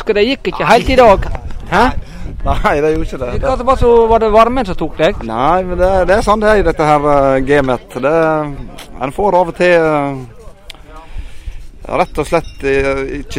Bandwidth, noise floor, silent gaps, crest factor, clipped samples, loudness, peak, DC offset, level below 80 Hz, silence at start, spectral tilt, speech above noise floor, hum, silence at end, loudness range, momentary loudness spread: 16 kHz; -33 dBFS; none; 12 dB; 0.2%; -12 LUFS; 0 dBFS; under 0.1%; -24 dBFS; 0 s; -6 dB/octave; 21 dB; none; 0 s; 5 LU; 15 LU